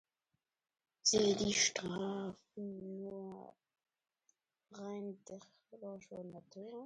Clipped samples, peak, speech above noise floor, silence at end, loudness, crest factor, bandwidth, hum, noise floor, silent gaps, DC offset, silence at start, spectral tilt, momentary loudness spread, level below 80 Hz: under 0.1%; -20 dBFS; 49 dB; 0 s; -37 LUFS; 22 dB; 11 kHz; none; -88 dBFS; none; under 0.1%; 1.05 s; -2.5 dB/octave; 21 LU; -72 dBFS